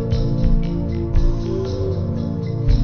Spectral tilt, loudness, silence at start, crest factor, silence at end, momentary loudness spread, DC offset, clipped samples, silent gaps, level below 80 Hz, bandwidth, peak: -9 dB/octave; -22 LUFS; 0 s; 14 dB; 0 s; 3 LU; under 0.1%; under 0.1%; none; -20 dBFS; 6.4 kHz; -4 dBFS